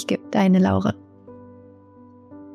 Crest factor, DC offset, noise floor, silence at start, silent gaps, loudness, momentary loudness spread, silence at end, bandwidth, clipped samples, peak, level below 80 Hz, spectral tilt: 16 dB; under 0.1%; -48 dBFS; 0 s; none; -20 LUFS; 11 LU; 0 s; 8.4 kHz; under 0.1%; -8 dBFS; -60 dBFS; -7.5 dB/octave